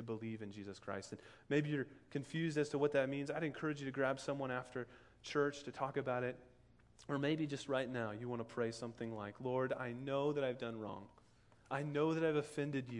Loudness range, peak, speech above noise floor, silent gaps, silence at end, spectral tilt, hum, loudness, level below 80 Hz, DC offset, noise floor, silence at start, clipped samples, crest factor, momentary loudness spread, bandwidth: 3 LU; -22 dBFS; 27 dB; none; 0 s; -6 dB/octave; none; -41 LUFS; -74 dBFS; under 0.1%; -67 dBFS; 0 s; under 0.1%; 20 dB; 11 LU; 11.5 kHz